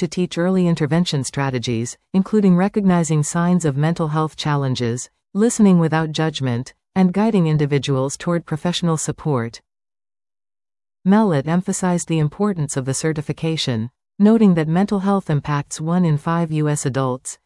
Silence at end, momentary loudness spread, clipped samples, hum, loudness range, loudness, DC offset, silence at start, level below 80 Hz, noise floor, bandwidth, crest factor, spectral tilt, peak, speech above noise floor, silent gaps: 0.1 s; 8 LU; under 0.1%; none; 3 LU; -19 LUFS; under 0.1%; 0 s; -52 dBFS; under -90 dBFS; 12 kHz; 14 dB; -6 dB/octave; -4 dBFS; over 72 dB; none